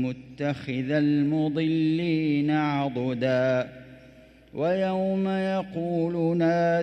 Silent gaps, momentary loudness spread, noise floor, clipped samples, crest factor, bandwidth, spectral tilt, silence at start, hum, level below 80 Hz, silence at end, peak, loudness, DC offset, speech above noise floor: none; 7 LU; -52 dBFS; under 0.1%; 12 dB; 8.6 kHz; -8 dB/octave; 0 s; none; -60 dBFS; 0 s; -12 dBFS; -26 LUFS; under 0.1%; 27 dB